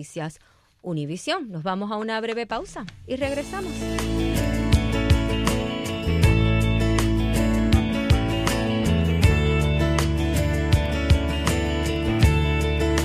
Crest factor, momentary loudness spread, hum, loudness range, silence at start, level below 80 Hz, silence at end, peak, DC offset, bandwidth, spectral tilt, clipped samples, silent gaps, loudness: 16 dB; 10 LU; none; 7 LU; 0 s; -28 dBFS; 0 s; -6 dBFS; under 0.1%; 15.5 kHz; -6 dB/octave; under 0.1%; none; -23 LUFS